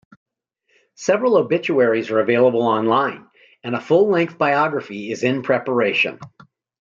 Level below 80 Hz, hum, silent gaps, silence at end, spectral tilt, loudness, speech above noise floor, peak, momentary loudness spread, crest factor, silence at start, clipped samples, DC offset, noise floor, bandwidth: -68 dBFS; none; none; 0.55 s; -5.5 dB/octave; -18 LUFS; 48 dB; -4 dBFS; 11 LU; 16 dB; 1 s; under 0.1%; under 0.1%; -66 dBFS; 7.6 kHz